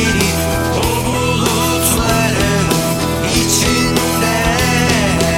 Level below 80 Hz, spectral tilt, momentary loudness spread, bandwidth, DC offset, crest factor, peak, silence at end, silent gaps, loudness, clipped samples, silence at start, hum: -28 dBFS; -4 dB/octave; 3 LU; 17 kHz; under 0.1%; 14 dB; 0 dBFS; 0 s; none; -14 LUFS; under 0.1%; 0 s; none